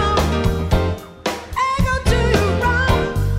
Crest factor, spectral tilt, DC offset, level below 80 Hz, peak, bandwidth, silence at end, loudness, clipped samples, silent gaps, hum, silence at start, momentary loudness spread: 16 dB; -5.5 dB/octave; under 0.1%; -24 dBFS; -2 dBFS; 16 kHz; 0 s; -19 LUFS; under 0.1%; none; none; 0 s; 8 LU